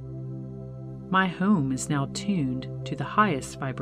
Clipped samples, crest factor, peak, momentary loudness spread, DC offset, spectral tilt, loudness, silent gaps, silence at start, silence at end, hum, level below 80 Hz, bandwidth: under 0.1%; 18 dB; -8 dBFS; 15 LU; under 0.1%; -5.5 dB/octave; -27 LUFS; none; 0 s; 0 s; none; -54 dBFS; 13 kHz